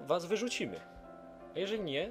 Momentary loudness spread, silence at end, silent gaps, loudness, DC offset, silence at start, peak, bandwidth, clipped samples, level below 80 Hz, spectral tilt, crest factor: 19 LU; 0 s; none; -36 LUFS; under 0.1%; 0 s; -18 dBFS; 15.5 kHz; under 0.1%; -64 dBFS; -4 dB/octave; 18 dB